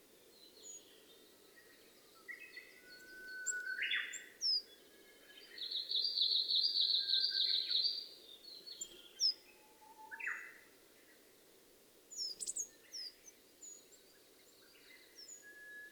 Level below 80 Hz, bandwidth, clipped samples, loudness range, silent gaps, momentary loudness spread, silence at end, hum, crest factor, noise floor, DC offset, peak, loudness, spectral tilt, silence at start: -86 dBFS; over 20 kHz; under 0.1%; 15 LU; none; 24 LU; 0 s; none; 20 dB; -66 dBFS; under 0.1%; -22 dBFS; -36 LUFS; 3 dB/octave; 0.3 s